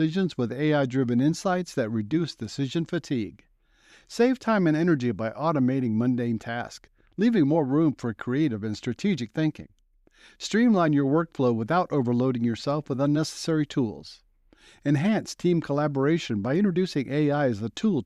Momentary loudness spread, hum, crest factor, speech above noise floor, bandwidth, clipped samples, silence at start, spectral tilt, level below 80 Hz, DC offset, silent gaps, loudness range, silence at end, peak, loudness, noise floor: 9 LU; none; 14 dB; 34 dB; 12 kHz; under 0.1%; 0 s; -7 dB/octave; -62 dBFS; under 0.1%; none; 3 LU; 0 s; -10 dBFS; -25 LUFS; -59 dBFS